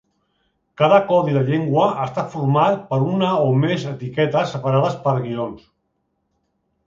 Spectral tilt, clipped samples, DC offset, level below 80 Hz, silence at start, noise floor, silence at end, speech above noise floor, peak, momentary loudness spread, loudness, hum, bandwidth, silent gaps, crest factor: -8 dB/octave; under 0.1%; under 0.1%; -60 dBFS; 0.8 s; -71 dBFS; 1.3 s; 53 dB; 0 dBFS; 9 LU; -19 LUFS; none; 7.6 kHz; none; 18 dB